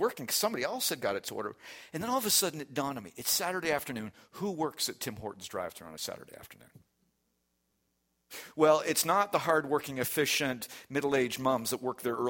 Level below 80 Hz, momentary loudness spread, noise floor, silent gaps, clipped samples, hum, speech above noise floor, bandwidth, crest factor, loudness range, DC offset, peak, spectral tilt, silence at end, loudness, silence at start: -70 dBFS; 15 LU; -78 dBFS; none; under 0.1%; none; 46 dB; 17 kHz; 22 dB; 11 LU; under 0.1%; -12 dBFS; -2.5 dB/octave; 0 s; -31 LUFS; 0 s